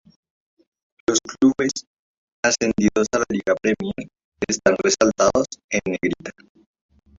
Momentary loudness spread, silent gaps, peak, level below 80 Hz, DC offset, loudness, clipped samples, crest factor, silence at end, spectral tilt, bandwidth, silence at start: 12 LU; 1.87-2.43 s, 4.24-4.32 s, 5.64-5.69 s; -2 dBFS; -50 dBFS; under 0.1%; -21 LUFS; under 0.1%; 20 dB; 0.85 s; -3.5 dB/octave; 7.8 kHz; 1.1 s